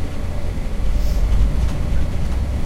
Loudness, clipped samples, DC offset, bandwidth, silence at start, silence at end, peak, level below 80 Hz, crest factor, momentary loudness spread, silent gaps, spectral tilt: -23 LUFS; under 0.1%; under 0.1%; 12.5 kHz; 0 s; 0 s; -4 dBFS; -20 dBFS; 14 dB; 7 LU; none; -7 dB/octave